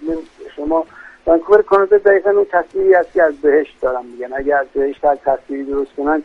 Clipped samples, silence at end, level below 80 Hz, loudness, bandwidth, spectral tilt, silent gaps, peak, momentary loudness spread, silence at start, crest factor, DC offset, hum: under 0.1%; 0 s; -44 dBFS; -15 LUFS; 4.9 kHz; -7 dB/octave; none; 0 dBFS; 13 LU; 0 s; 16 dB; under 0.1%; none